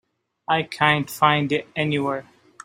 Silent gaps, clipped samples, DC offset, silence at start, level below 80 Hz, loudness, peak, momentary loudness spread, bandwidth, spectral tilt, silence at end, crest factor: none; under 0.1%; under 0.1%; 0.5 s; -62 dBFS; -21 LUFS; -2 dBFS; 9 LU; 16 kHz; -5 dB/octave; 0.4 s; 22 dB